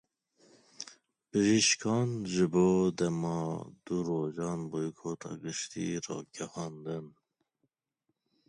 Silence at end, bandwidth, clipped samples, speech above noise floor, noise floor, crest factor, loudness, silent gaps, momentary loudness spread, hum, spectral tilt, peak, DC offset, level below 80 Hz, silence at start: 1.4 s; 10.5 kHz; under 0.1%; 52 dB; -83 dBFS; 18 dB; -32 LUFS; none; 15 LU; none; -4.5 dB/octave; -16 dBFS; under 0.1%; -66 dBFS; 0.8 s